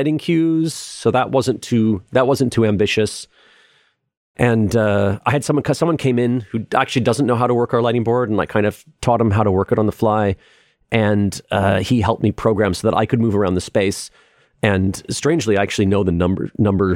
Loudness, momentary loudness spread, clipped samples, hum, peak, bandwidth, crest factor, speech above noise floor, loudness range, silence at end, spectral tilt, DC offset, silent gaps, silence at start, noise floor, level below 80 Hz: -18 LUFS; 5 LU; under 0.1%; none; -2 dBFS; 16 kHz; 16 dB; 42 dB; 1 LU; 0 s; -6 dB/octave; under 0.1%; 4.17-4.34 s; 0 s; -59 dBFS; -46 dBFS